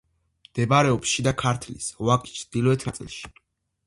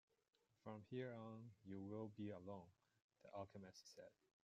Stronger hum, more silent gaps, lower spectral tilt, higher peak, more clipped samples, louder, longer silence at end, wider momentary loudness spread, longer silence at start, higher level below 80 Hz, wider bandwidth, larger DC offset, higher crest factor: neither; second, none vs 3.02-3.09 s; second, -5 dB/octave vs -6.5 dB/octave; first, -6 dBFS vs -38 dBFS; neither; first, -24 LUFS vs -56 LUFS; first, 0.6 s vs 0.35 s; first, 16 LU vs 10 LU; about the same, 0.55 s vs 0.65 s; first, -50 dBFS vs under -90 dBFS; first, 11.5 kHz vs 8 kHz; neither; about the same, 20 dB vs 18 dB